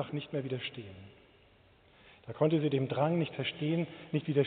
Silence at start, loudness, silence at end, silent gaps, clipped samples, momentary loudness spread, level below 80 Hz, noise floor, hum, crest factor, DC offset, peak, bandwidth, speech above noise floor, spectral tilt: 0 s; -33 LUFS; 0 s; none; under 0.1%; 18 LU; -70 dBFS; -63 dBFS; none; 18 dB; under 0.1%; -14 dBFS; 4.5 kHz; 30 dB; -6 dB/octave